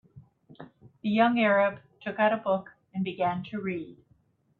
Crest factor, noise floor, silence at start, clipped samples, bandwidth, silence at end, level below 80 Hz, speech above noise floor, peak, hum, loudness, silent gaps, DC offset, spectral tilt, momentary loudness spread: 18 dB; -66 dBFS; 0.15 s; under 0.1%; 4.5 kHz; 0.65 s; -70 dBFS; 40 dB; -10 dBFS; none; -27 LUFS; none; under 0.1%; -9 dB/octave; 15 LU